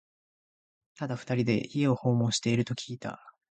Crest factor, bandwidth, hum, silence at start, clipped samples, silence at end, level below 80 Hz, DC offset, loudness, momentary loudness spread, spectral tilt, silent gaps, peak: 18 dB; 9.2 kHz; none; 1 s; under 0.1%; 0.2 s; -64 dBFS; under 0.1%; -29 LUFS; 13 LU; -5.5 dB/octave; none; -12 dBFS